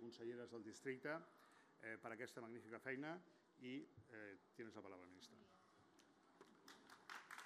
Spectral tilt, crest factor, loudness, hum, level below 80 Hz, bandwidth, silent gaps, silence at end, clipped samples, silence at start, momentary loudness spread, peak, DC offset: -5 dB/octave; 22 dB; -56 LUFS; none; under -90 dBFS; 13.5 kHz; none; 0 s; under 0.1%; 0 s; 14 LU; -34 dBFS; under 0.1%